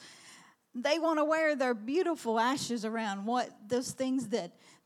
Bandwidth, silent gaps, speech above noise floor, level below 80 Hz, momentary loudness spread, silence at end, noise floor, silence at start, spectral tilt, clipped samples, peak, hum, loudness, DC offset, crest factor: 15.5 kHz; none; 26 dB; -82 dBFS; 8 LU; 0.35 s; -57 dBFS; 0 s; -4 dB/octave; under 0.1%; -16 dBFS; none; -32 LUFS; under 0.1%; 16 dB